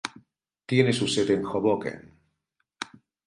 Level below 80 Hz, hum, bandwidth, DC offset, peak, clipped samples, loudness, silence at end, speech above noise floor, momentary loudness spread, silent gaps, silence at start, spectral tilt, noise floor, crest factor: -62 dBFS; none; 11.5 kHz; under 0.1%; -6 dBFS; under 0.1%; -25 LUFS; 0.45 s; 54 dB; 16 LU; none; 0.05 s; -5 dB/octave; -78 dBFS; 22 dB